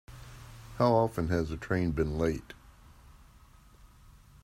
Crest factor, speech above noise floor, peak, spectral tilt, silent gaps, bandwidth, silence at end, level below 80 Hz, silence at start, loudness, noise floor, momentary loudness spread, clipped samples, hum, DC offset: 20 dB; 28 dB; -12 dBFS; -7.5 dB/octave; none; 16 kHz; 0.6 s; -48 dBFS; 0.1 s; -30 LUFS; -57 dBFS; 24 LU; under 0.1%; none; under 0.1%